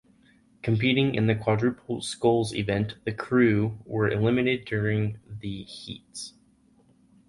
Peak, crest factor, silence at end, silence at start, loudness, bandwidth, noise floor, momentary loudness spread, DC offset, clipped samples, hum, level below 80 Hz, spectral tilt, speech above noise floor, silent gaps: -8 dBFS; 18 dB; 1 s; 0.65 s; -26 LUFS; 11.5 kHz; -61 dBFS; 15 LU; under 0.1%; under 0.1%; none; -54 dBFS; -6.5 dB/octave; 36 dB; none